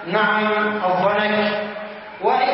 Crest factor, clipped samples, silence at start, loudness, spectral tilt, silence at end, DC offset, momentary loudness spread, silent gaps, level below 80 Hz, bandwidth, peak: 16 dB; under 0.1%; 0 s; -19 LUFS; -9.5 dB/octave; 0 s; under 0.1%; 11 LU; none; -66 dBFS; 5.8 kHz; -4 dBFS